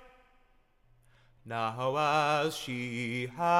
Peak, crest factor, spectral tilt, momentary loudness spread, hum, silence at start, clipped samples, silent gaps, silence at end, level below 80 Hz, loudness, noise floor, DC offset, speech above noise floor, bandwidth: -12 dBFS; 20 dB; -5 dB/octave; 8 LU; none; 0 s; under 0.1%; none; 0 s; -66 dBFS; -31 LUFS; -66 dBFS; under 0.1%; 35 dB; 16.5 kHz